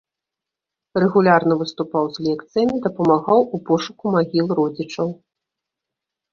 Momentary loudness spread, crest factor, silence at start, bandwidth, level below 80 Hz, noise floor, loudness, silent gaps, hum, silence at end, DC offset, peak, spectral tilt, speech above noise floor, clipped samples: 9 LU; 18 dB; 0.95 s; 7.2 kHz; -60 dBFS; -86 dBFS; -19 LUFS; none; none; 1.2 s; under 0.1%; -2 dBFS; -7 dB/octave; 67 dB; under 0.1%